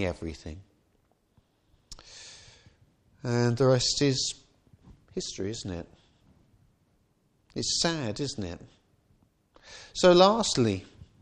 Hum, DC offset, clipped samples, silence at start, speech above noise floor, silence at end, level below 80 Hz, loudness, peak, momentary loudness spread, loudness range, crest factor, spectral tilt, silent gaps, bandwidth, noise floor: none; under 0.1%; under 0.1%; 0 s; 43 dB; 0.2 s; -54 dBFS; -26 LUFS; -6 dBFS; 25 LU; 13 LU; 24 dB; -4.5 dB/octave; none; 10.5 kHz; -69 dBFS